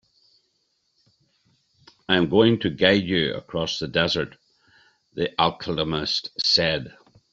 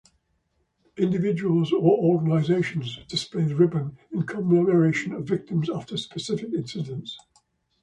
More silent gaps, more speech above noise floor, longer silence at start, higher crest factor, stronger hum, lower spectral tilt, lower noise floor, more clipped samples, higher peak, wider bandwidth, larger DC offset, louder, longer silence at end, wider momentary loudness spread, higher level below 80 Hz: neither; about the same, 49 dB vs 48 dB; first, 2.1 s vs 0.95 s; about the same, 22 dB vs 18 dB; neither; second, -5 dB/octave vs -7 dB/octave; about the same, -71 dBFS vs -71 dBFS; neither; first, -2 dBFS vs -8 dBFS; second, 8 kHz vs 11 kHz; neither; about the same, -22 LUFS vs -24 LUFS; second, 0.45 s vs 0.65 s; about the same, 11 LU vs 12 LU; first, -54 dBFS vs -62 dBFS